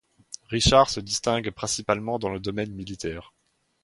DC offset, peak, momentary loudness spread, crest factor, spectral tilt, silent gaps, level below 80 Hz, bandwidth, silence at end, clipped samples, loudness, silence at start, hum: under 0.1%; -4 dBFS; 15 LU; 22 dB; -3.5 dB/octave; none; -42 dBFS; 11.5 kHz; 0.6 s; under 0.1%; -25 LUFS; 0.3 s; none